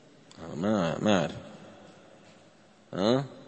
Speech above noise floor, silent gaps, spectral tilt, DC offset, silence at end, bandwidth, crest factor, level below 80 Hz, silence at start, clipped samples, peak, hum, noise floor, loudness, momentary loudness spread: 31 dB; none; -6 dB/octave; under 0.1%; 0 s; 8.6 kHz; 22 dB; -64 dBFS; 0.4 s; under 0.1%; -10 dBFS; none; -58 dBFS; -28 LUFS; 21 LU